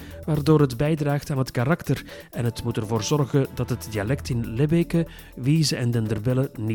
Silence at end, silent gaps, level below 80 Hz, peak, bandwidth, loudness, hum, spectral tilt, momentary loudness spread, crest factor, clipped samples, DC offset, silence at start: 0 s; none; -44 dBFS; -4 dBFS; 19 kHz; -24 LUFS; none; -6.5 dB/octave; 8 LU; 18 dB; under 0.1%; under 0.1%; 0 s